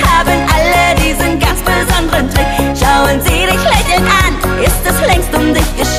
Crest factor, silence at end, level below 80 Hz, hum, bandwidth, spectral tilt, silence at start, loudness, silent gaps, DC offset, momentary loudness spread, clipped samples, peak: 10 dB; 0 s; -18 dBFS; none; 15.5 kHz; -4 dB/octave; 0 s; -11 LUFS; none; under 0.1%; 3 LU; under 0.1%; 0 dBFS